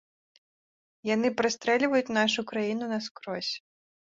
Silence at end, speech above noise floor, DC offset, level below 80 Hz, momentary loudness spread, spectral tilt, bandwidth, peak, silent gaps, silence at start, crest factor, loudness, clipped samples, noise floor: 0.55 s; over 62 dB; under 0.1%; -72 dBFS; 10 LU; -3.5 dB/octave; 7.8 kHz; -10 dBFS; 3.11-3.15 s; 1.05 s; 20 dB; -28 LUFS; under 0.1%; under -90 dBFS